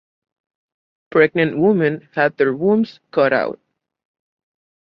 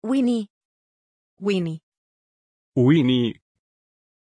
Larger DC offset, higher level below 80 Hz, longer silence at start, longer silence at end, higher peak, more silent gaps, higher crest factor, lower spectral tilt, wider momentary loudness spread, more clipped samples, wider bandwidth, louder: neither; about the same, -64 dBFS vs -64 dBFS; first, 1.1 s vs 0 s; first, 1.3 s vs 0.95 s; first, -2 dBFS vs -6 dBFS; second, none vs 0.50-1.37 s, 1.83-2.72 s; about the same, 18 dB vs 18 dB; first, -9.5 dB/octave vs -7.5 dB/octave; second, 5 LU vs 13 LU; neither; second, 5.8 kHz vs 10 kHz; first, -18 LUFS vs -22 LUFS